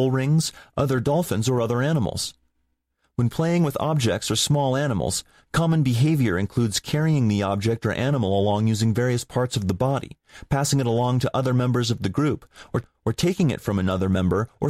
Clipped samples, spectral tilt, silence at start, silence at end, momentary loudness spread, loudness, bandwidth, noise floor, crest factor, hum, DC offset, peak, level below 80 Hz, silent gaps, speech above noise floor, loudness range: under 0.1%; -5.5 dB/octave; 0 s; 0 s; 7 LU; -23 LUFS; 15.5 kHz; -72 dBFS; 14 dB; none; under 0.1%; -8 dBFS; -48 dBFS; none; 50 dB; 2 LU